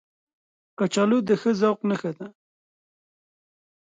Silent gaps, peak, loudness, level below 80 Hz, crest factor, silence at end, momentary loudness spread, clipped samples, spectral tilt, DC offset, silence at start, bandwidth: none; -10 dBFS; -23 LUFS; -72 dBFS; 18 dB; 1.6 s; 14 LU; under 0.1%; -6 dB/octave; under 0.1%; 0.8 s; 9.4 kHz